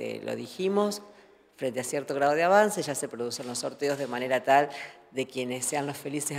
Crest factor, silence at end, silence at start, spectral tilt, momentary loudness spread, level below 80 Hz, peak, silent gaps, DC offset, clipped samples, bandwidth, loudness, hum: 20 dB; 0 s; 0 s; -3.5 dB/octave; 13 LU; -76 dBFS; -8 dBFS; none; under 0.1%; under 0.1%; 16 kHz; -28 LUFS; none